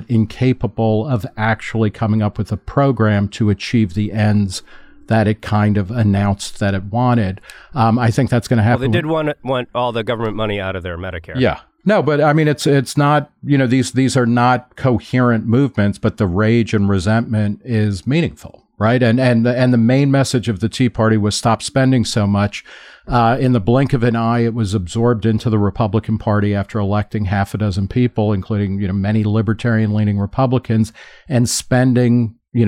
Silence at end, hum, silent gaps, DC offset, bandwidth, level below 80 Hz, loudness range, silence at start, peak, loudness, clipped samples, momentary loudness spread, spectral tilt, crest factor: 0 s; none; none; under 0.1%; 14.5 kHz; -42 dBFS; 3 LU; 0 s; -2 dBFS; -16 LUFS; under 0.1%; 6 LU; -6.5 dB/octave; 12 dB